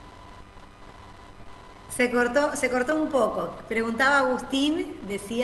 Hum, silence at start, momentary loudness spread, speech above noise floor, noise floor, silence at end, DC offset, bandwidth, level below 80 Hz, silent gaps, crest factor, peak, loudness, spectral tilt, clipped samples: none; 0 s; 12 LU; 22 dB; -46 dBFS; 0 s; under 0.1%; 12 kHz; -52 dBFS; none; 18 dB; -10 dBFS; -25 LUFS; -3.5 dB/octave; under 0.1%